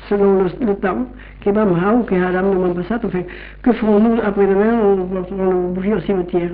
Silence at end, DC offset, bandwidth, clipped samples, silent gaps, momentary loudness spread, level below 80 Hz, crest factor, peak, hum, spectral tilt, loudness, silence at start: 0 s; under 0.1%; 4.7 kHz; under 0.1%; none; 9 LU; -38 dBFS; 12 dB; -4 dBFS; none; -7.5 dB/octave; -17 LUFS; 0 s